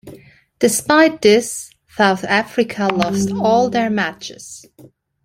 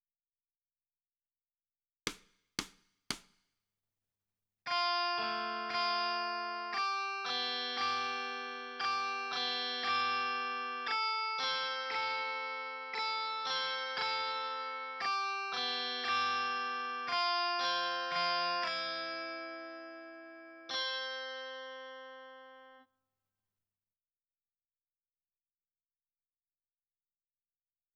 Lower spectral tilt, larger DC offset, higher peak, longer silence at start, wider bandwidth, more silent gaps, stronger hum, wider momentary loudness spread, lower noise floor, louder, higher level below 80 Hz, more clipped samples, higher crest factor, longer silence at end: first, -4 dB/octave vs -1 dB/octave; neither; first, 0 dBFS vs -16 dBFS; second, 0.05 s vs 2.05 s; first, 16.5 kHz vs 10.5 kHz; neither; neither; first, 19 LU vs 14 LU; second, -47 dBFS vs under -90 dBFS; first, -16 LUFS vs -35 LUFS; first, -54 dBFS vs -78 dBFS; neither; second, 16 dB vs 22 dB; second, 0.65 s vs 5.15 s